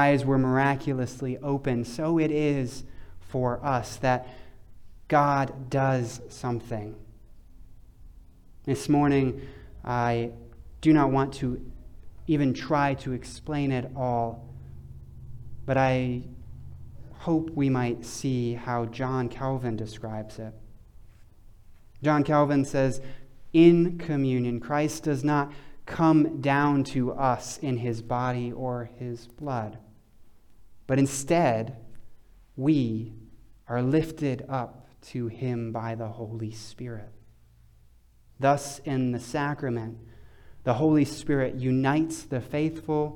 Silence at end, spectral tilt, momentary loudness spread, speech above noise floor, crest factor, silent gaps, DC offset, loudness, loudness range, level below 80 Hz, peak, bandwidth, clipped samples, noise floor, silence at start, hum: 0 s; -7 dB/octave; 18 LU; 31 dB; 22 dB; none; under 0.1%; -27 LUFS; 8 LU; -50 dBFS; -6 dBFS; 15.5 kHz; under 0.1%; -56 dBFS; 0 s; none